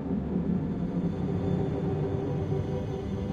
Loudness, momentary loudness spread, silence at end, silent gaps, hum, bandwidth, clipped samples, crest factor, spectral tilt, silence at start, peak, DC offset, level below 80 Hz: -30 LUFS; 3 LU; 0 s; none; none; 7.2 kHz; under 0.1%; 12 dB; -9.5 dB/octave; 0 s; -16 dBFS; under 0.1%; -44 dBFS